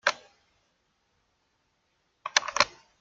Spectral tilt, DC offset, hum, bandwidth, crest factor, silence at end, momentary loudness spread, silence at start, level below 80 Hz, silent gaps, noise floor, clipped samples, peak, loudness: 1 dB/octave; under 0.1%; none; 11 kHz; 32 dB; 0.3 s; 18 LU; 0.05 s; -70 dBFS; none; -74 dBFS; under 0.1%; -2 dBFS; -27 LUFS